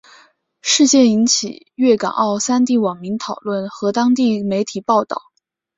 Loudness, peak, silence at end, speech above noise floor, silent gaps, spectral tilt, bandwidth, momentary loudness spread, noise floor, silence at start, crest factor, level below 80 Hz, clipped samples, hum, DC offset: -16 LUFS; -2 dBFS; 0.6 s; 35 dB; none; -3.5 dB/octave; 7.8 kHz; 12 LU; -51 dBFS; 0.65 s; 16 dB; -62 dBFS; under 0.1%; none; under 0.1%